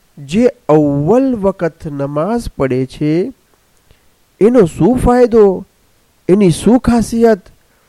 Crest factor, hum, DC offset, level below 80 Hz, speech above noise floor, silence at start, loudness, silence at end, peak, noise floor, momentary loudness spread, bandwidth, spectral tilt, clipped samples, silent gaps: 12 dB; none; under 0.1%; -32 dBFS; 42 dB; 0.15 s; -12 LUFS; 0.5 s; 0 dBFS; -53 dBFS; 10 LU; 13 kHz; -7.5 dB/octave; under 0.1%; none